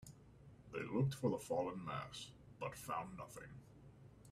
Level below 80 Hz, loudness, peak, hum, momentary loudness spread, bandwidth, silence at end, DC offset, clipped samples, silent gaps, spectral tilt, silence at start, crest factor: -70 dBFS; -44 LUFS; -26 dBFS; none; 23 LU; 15.5 kHz; 0 s; under 0.1%; under 0.1%; none; -6 dB/octave; 0 s; 18 dB